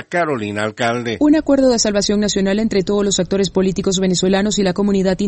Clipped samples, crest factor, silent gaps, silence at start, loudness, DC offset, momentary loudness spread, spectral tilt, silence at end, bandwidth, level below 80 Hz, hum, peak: under 0.1%; 14 dB; none; 0 s; -16 LUFS; under 0.1%; 6 LU; -4.5 dB/octave; 0 s; 8.6 kHz; -40 dBFS; none; -2 dBFS